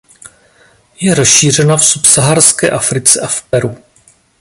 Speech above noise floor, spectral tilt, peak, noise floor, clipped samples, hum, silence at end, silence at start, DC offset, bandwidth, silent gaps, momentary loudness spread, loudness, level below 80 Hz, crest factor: 39 dB; -3 dB/octave; 0 dBFS; -49 dBFS; 0.4%; none; 0.65 s; 0.25 s; under 0.1%; 16 kHz; none; 10 LU; -8 LUFS; -46 dBFS; 12 dB